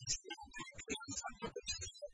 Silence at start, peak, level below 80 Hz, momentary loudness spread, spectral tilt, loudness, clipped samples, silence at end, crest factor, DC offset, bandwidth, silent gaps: 0 s; -26 dBFS; -60 dBFS; 8 LU; -1.5 dB/octave; -45 LUFS; under 0.1%; 0 s; 20 dB; under 0.1%; 10.5 kHz; none